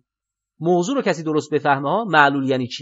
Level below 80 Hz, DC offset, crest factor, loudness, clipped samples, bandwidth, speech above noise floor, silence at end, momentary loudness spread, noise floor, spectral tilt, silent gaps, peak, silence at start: -76 dBFS; under 0.1%; 20 dB; -19 LUFS; under 0.1%; 8 kHz; 67 dB; 0 s; 7 LU; -86 dBFS; -5.5 dB/octave; none; 0 dBFS; 0.6 s